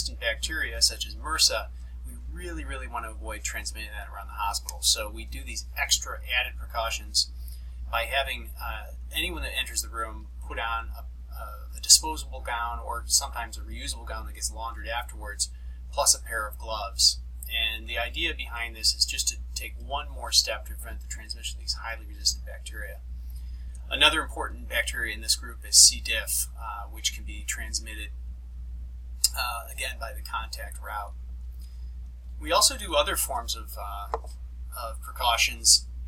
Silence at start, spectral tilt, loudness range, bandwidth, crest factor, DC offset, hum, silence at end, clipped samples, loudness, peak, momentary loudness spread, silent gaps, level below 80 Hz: 0 s; -0.5 dB/octave; 9 LU; 16.5 kHz; 28 dB; under 0.1%; none; 0 s; under 0.1%; -26 LUFS; 0 dBFS; 19 LU; none; -38 dBFS